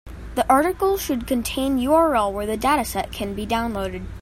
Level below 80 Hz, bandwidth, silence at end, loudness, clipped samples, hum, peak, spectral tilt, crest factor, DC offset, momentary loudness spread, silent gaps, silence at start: -38 dBFS; 16.5 kHz; 0 s; -22 LUFS; under 0.1%; none; -4 dBFS; -4.5 dB/octave; 18 dB; under 0.1%; 10 LU; none; 0.05 s